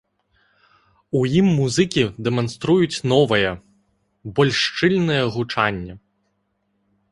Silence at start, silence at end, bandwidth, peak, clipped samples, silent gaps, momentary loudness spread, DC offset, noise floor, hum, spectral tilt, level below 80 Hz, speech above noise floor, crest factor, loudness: 1.15 s; 1.15 s; 11.5 kHz; -2 dBFS; under 0.1%; none; 9 LU; under 0.1%; -70 dBFS; none; -5.5 dB/octave; -50 dBFS; 51 dB; 18 dB; -19 LUFS